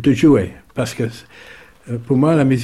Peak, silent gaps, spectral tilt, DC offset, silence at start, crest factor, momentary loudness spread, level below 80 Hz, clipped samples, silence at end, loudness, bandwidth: -2 dBFS; none; -7.5 dB/octave; under 0.1%; 0 s; 14 dB; 16 LU; -48 dBFS; under 0.1%; 0 s; -17 LUFS; 13.5 kHz